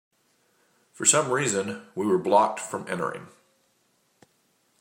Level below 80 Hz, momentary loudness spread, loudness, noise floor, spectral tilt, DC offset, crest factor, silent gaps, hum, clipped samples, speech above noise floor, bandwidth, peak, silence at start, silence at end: -74 dBFS; 13 LU; -24 LUFS; -68 dBFS; -3 dB/octave; under 0.1%; 26 dB; none; none; under 0.1%; 44 dB; 16 kHz; -2 dBFS; 1 s; 1.5 s